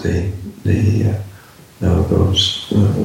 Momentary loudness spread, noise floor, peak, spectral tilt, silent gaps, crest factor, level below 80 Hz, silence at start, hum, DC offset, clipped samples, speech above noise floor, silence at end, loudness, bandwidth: 11 LU; -39 dBFS; -2 dBFS; -6 dB/octave; none; 14 dB; -32 dBFS; 0 s; none; under 0.1%; under 0.1%; 24 dB; 0 s; -17 LUFS; 13.5 kHz